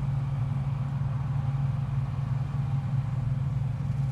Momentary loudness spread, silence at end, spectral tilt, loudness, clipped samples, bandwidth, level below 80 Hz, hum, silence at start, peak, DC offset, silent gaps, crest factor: 1 LU; 0 s; -9 dB/octave; -30 LUFS; under 0.1%; 5 kHz; -42 dBFS; none; 0 s; -18 dBFS; under 0.1%; none; 10 dB